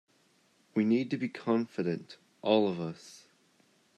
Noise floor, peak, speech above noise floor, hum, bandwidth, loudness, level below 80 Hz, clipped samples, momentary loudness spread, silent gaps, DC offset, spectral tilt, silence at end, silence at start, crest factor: -68 dBFS; -12 dBFS; 38 dB; none; 9.8 kHz; -31 LUFS; -82 dBFS; under 0.1%; 16 LU; none; under 0.1%; -7 dB/octave; 0.8 s; 0.75 s; 22 dB